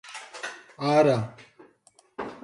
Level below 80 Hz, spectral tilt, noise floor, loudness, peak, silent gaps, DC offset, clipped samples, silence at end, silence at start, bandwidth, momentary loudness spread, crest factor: -68 dBFS; -6 dB/octave; -61 dBFS; -25 LUFS; -8 dBFS; none; under 0.1%; under 0.1%; 0.05 s; 0.05 s; 11.5 kHz; 19 LU; 20 dB